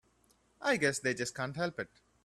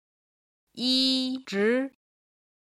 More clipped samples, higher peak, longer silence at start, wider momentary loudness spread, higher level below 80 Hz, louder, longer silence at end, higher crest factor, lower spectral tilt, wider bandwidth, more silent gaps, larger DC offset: neither; second, -14 dBFS vs -10 dBFS; second, 0.6 s vs 0.75 s; first, 11 LU vs 8 LU; first, -70 dBFS vs -76 dBFS; second, -34 LUFS vs -25 LUFS; second, 0.4 s vs 0.75 s; about the same, 22 dB vs 18 dB; about the same, -4 dB/octave vs -3.5 dB/octave; first, 14 kHz vs 12 kHz; neither; neither